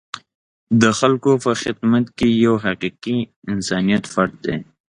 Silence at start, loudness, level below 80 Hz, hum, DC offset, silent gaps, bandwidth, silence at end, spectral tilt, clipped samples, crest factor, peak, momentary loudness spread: 0.15 s; -18 LUFS; -50 dBFS; none; under 0.1%; 0.35-0.67 s, 3.36-3.42 s; 11 kHz; 0.25 s; -5.5 dB/octave; under 0.1%; 18 dB; 0 dBFS; 10 LU